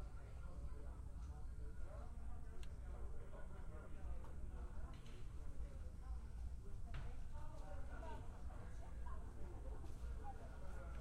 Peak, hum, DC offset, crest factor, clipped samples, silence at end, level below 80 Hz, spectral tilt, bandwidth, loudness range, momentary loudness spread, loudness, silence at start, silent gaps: -36 dBFS; none; under 0.1%; 12 dB; under 0.1%; 0 s; -50 dBFS; -7 dB/octave; 10.5 kHz; 1 LU; 3 LU; -55 LUFS; 0 s; none